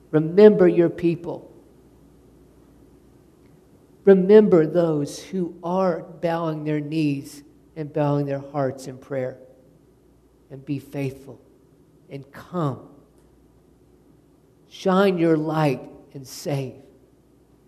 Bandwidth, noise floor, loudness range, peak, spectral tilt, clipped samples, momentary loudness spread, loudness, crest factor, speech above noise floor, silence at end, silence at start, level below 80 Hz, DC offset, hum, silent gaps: 13.5 kHz; -56 dBFS; 15 LU; -2 dBFS; -7.5 dB/octave; under 0.1%; 24 LU; -21 LUFS; 22 dB; 36 dB; 0.95 s; 0.1 s; -62 dBFS; under 0.1%; none; none